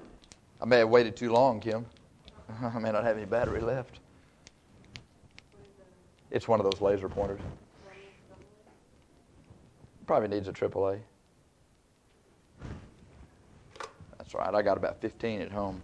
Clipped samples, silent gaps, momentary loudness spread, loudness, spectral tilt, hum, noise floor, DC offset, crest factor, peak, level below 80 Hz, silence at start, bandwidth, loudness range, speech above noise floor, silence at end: under 0.1%; none; 23 LU; -29 LUFS; -6.5 dB/octave; none; -65 dBFS; under 0.1%; 24 dB; -8 dBFS; -56 dBFS; 0 s; 10 kHz; 11 LU; 36 dB; 0 s